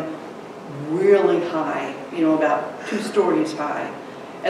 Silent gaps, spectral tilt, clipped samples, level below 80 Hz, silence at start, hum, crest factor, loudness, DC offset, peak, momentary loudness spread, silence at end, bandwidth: none; -6 dB/octave; under 0.1%; -72 dBFS; 0 s; none; 16 dB; -21 LUFS; under 0.1%; -4 dBFS; 18 LU; 0 s; 12 kHz